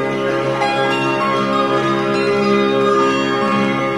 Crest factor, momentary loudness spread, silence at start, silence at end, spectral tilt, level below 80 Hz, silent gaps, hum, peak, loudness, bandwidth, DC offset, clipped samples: 12 dB; 3 LU; 0 s; 0 s; -5.5 dB/octave; -54 dBFS; none; none; -4 dBFS; -16 LUFS; 12 kHz; 0.2%; under 0.1%